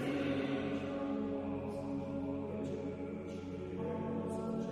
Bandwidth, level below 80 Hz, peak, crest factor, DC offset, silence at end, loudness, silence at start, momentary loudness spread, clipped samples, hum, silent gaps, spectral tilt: 11 kHz; -64 dBFS; -24 dBFS; 14 dB; under 0.1%; 0 s; -39 LUFS; 0 s; 7 LU; under 0.1%; none; none; -7.5 dB/octave